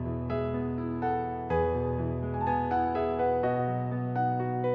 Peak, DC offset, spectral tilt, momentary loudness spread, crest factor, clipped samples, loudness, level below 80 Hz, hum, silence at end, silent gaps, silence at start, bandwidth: -16 dBFS; under 0.1%; -10.5 dB/octave; 4 LU; 12 dB; under 0.1%; -30 LUFS; -44 dBFS; none; 0 s; none; 0 s; 5.4 kHz